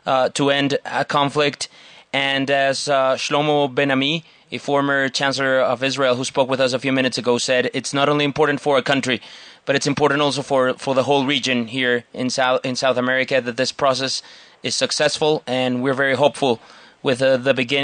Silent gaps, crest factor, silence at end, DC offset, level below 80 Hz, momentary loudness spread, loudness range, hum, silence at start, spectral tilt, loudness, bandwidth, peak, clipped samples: none; 18 dB; 0 s; under 0.1%; -64 dBFS; 6 LU; 1 LU; none; 0.05 s; -4 dB/octave; -19 LUFS; 10 kHz; 0 dBFS; under 0.1%